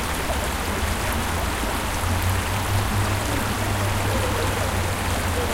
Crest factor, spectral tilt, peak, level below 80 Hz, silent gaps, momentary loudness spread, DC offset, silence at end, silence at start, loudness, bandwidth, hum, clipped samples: 12 dB; -4 dB/octave; -10 dBFS; -30 dBFS; none; 2 LU; under 0.1%; 0 s; 0 s; -24 LUFS; 17 kHz; none; under 0.1%